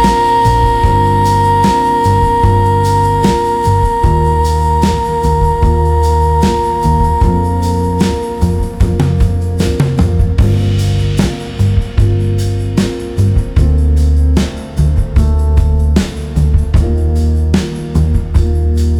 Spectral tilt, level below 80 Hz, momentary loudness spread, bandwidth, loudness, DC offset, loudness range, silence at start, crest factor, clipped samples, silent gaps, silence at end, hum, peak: -7 dB/octave; -16 dBFS; 5 LU; 13 kHz; -12 LUFS; under 0.1%; 3 LU; 0 s; 10 dB; under 0.1%; none; 0 s; none; 0 dBFS